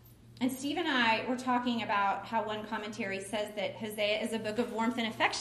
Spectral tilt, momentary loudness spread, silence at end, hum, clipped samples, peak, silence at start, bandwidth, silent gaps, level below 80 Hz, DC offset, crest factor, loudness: -3.5 dB/octave; 8 LU; 0 s; none; under 0.1%; -14 dBFS; 0.05 s; 14.5 kHz; none; -68 dBFS; under 0.1%; 18 dB; -32 LUFS